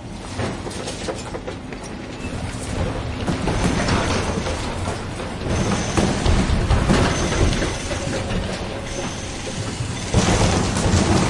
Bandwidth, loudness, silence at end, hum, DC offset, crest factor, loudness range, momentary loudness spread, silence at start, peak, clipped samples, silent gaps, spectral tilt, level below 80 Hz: 11.5 kHz; -22 LUFS; 0 s; none; under 0.1%; 18 dB; 5 LU; 11 LU; 0 s; -4 dBFS; under 0.1%; none; -5 dB/octave; -30 dBFS